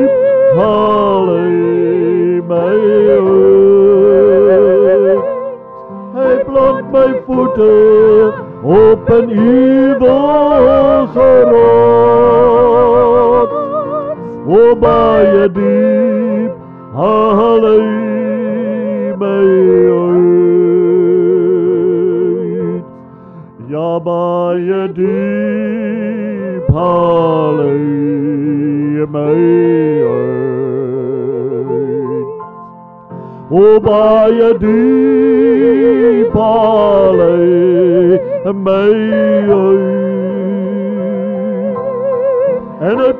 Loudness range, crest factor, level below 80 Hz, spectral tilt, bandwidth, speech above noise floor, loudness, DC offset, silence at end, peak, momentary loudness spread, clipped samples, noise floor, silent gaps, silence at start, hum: 7 LU; 10 dB; -40 dBFS; -10.5 dB/octave; 4.3 kHz; 25 dB; -10 LUFS; under 0.1%; 0 s; 0 dBFS; 10 LU; under 0.1%; -34 dBFS; none; 0 s; none